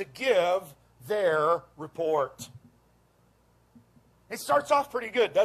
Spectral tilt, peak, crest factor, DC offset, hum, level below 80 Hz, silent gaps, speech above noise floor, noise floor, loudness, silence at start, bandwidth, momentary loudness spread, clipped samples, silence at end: -3.5 dB/octave; -12 dBFS; 18 dB; under 0.1%; none; -68 dBFS; none; 38 dB; -64 dBFS; -27 LUFS; 0 s; 14.5 kHz; 16 LU; under 0.1%; 0 s